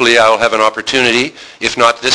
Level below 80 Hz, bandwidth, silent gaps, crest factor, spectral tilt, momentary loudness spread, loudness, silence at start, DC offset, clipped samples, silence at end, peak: -46 dBFS; 11 kHz; none; 12 dB; -2 dB/octave; 9 LU; -11 LUFS; 0 s; under 0.1%; 0.3%; 0 s; 0 dBFS